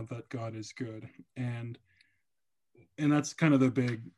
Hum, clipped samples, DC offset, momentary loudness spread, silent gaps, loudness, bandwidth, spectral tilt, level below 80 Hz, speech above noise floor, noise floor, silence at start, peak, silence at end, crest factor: none; under 0.1%; under 0.1%; 20 LU; none; -31 LUFS; 11.5 kHz; -6.5 dB/octave; -76 dBFS; over 59 dB; under -90 dBFS; 0 s; -12 dBFS; 0.1 s; 20 dB